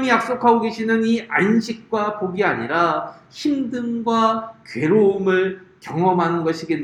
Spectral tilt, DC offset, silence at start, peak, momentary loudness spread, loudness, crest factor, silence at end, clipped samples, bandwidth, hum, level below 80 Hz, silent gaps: -6.5 dB/octave; under 0.1%; 0 s; -2 dBFS; 9 LU; -20 LUFS; 18 dB; 0 s; under 0.1%; 11.5 kHz; none; -62 dBFS; none